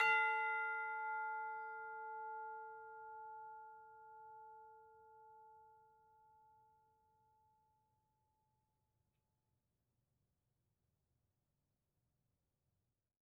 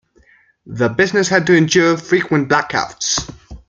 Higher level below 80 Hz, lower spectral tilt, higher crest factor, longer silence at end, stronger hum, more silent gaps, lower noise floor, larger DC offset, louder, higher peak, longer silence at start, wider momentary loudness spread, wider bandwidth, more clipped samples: second, under -90 dBFS vs -46 dBFS; second, 3.5 dB/octave vs -4 dB/octave; first, 26 dB vs 16 dB; first, 7.45 s vs 0.1 s; neither; neither; first, -89 dBFS vs -52 dBFS; neither; second, -43 LUFS vs -15 LUFS; second, -22 dBFS vs 0 dBFS; second, 0 s vs 0.65 s; first, 25 LU vs 8 LU; about the same, 8 kHz vs 8.8 kHz; neither